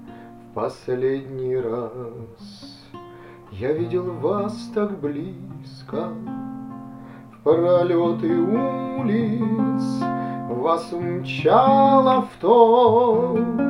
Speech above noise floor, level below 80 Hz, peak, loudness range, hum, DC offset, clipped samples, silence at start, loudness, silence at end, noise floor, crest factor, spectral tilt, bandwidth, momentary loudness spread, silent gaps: 22 dB; -58 dBFS; -2 dBFS; 11 LU; none; under 0.1%; under 0.1%; 0 s; -20 LUFS; 0 s; -42 dBFS; 20 dB; -8 dB/octave; 11.5 kHz; 23 LU; none